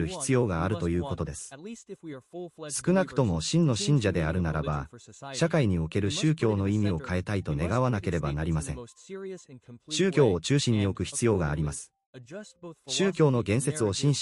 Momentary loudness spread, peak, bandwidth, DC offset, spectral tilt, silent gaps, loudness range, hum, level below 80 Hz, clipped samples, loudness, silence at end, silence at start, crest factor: 18 LU; -10 dBFS; 12 kHz; under 0.1%; -5.5 dB/octave; 12.06-12.13 s; 3 LU; none; -46 dBFS; under 0.1%; -27 LUFS; 0 s; 0 s; 18 dB